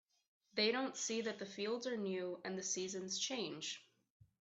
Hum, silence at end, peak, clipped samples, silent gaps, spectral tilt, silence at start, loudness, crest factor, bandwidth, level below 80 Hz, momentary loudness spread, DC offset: none; 0.6 s; -22 dBFS; under 0.1%; none; -2.5 dB/octave; 0.55 s; -41 LUFS; 22 dB; 8.4 kHz; -88 dBFS; 9 LU; under 0.1%